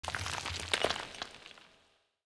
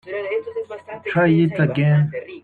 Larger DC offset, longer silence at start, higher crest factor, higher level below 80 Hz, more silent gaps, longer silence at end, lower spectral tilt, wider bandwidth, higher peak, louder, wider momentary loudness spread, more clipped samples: neither; about the same, 0 s vs 0.05 s; first, 26 dB vs 14 dB; about the same, -58 dBFS vs -58 dBFS; neither; first, 0.6 s vs 0.05 s; second, -2 dB/octave vs -10 dB/octave; first, 11 kHz vs 4.4 kHz; second, -14 dBFS vs -6 dBFS; second, -36 LUFS vs -19 LUFS; first, 20 LU vs 14 LU; neither